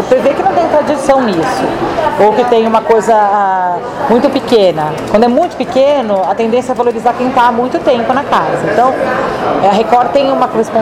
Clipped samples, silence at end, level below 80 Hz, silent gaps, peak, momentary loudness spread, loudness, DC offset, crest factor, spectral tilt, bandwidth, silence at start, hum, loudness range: under 0.1%; 0 s; -42 dBFS; none; 0 dBFS; 4 LU; -11 LUFS; under 0.1%; 10 dB; -5.5 dB/octave; 15 kHz; 0 s; none; 1 LU